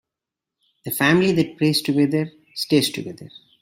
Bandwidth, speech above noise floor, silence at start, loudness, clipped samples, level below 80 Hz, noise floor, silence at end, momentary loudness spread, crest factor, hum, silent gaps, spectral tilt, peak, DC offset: 16.5 kHz; 66 dB; 0.85 s; -20 LUFS; under 0.1%; -60 dBFS; -86 dBFS; 0.35 s; 16 LU; 18 dB; none; none; -5 dB/octave; -4 dBFS; under 0.1%